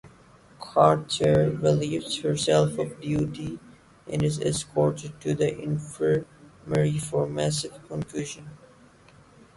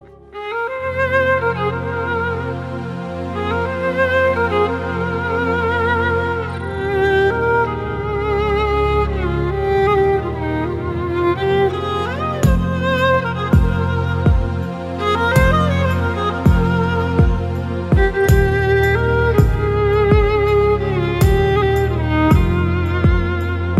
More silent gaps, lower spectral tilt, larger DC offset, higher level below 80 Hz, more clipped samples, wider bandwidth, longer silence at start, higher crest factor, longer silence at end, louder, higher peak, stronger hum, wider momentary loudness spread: neither; second, -5.5 dB/octave vs -7.5 dB/octave; neither; second, -54 dBFS vs -24 dBFS; neither; second, 11.5 kHz vs 13.5 kHz; about the same, 0.05 s vs 0.1 s; first, 22 dB vs 16 dB; first, 1 s vs 0 s; second, -26 LUFS vs -17 LUFS; second, -4 dBFS vs 0 dBFS; neither; first, 13 LU vs 8 LU